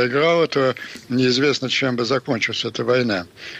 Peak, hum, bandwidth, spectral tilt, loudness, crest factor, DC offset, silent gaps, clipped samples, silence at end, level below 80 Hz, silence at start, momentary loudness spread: -8 dBFS; none; 12.5 kHz; -4.5 dB/octave; -20 LUFS; 12 dB; under 0.1%; none; under 0.1%; 0 s; -62 dBFS; 0 s; 6 LU